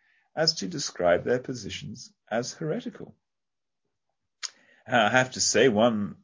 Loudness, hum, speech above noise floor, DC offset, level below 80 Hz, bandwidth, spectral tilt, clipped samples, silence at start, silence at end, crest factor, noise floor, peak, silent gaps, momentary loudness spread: -25 LUFS; none; over 64 dB; under 0.1%; -60 dBFS; 7.8 kHz; -3.5 dB/octave; under 0.1%; 0.35 s; 0.1 s; 22 dB; under -90 dBFS; -6 dBFS; none; 17 LU